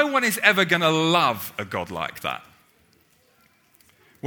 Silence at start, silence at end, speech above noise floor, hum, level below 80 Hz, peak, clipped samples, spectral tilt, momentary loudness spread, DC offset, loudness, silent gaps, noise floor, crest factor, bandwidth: 0 s; 0 s; 38 dB; none; -64 dBFS; 0 dBFS; under 0.1%; -3.5 dB/octave; 13 LU; under 0.1%; -21 LUFS; none; -61 dBFS; 24 dB; over 20 kHz